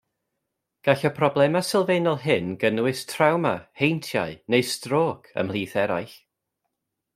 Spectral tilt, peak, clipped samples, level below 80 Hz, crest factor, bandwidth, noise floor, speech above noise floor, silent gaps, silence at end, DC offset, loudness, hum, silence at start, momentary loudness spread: -5.5 dB/octave; -2 dBFS; under 0.1%; -66 dBFS; 22 dB; 16 kHz; -81 dBFS; 58 dB; none; 1 s; under 0.1%; -24 LUFS; none; 0.85 s; 7 LU